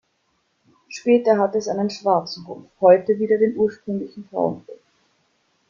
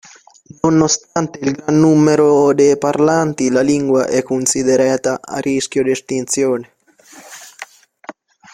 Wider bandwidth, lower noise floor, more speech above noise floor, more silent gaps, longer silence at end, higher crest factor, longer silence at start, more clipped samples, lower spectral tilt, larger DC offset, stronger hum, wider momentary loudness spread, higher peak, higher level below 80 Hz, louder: second, 7.4 kHz vs 15.5 kHz; first, -68 dBFS vs -44 dBFS; first, 49 dB vs 30 dB; neither; first, 0.95 s vs 0.4 s; first, 20 dB vs 14 dB; first, 0.9 s vs 0.65 s; neither; about the same, -6 dB/octave vs -5 dB/octave; neither; neither; first, 17 LU vs 13 LU; about the same, -2 dBFS vs 0 dBFS; second, -66 dBFS vs -54 dBFS; second, -20 LUFS vs -15 LUFS